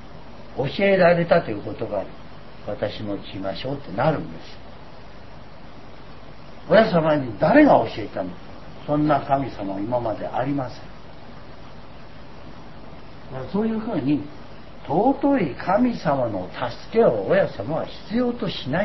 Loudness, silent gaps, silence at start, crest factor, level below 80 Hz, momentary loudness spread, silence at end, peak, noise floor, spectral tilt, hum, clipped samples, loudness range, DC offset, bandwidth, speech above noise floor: -22 LUFS; none; 0 s; 22 dB; -48 dBFS; 26 LU; 0 s; -2 dBFS; -43 dBFS; -8.5 dB/octave; none; under 0.1%; 10 LU; 1%; 6 kHz; 21 dB